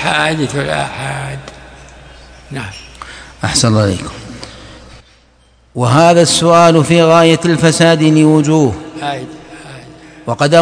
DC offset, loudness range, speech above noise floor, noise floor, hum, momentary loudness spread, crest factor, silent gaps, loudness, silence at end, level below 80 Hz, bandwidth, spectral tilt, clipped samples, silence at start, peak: under 0.1%; 10 LU; 38 dB; -49 dBFS; none; 23 LU; 12 dB; none; -11 LUFS; 0 s; -42 dBFS; 11 kHz; -5 dB/octave; 0.9%; 0 s; 0 dBFS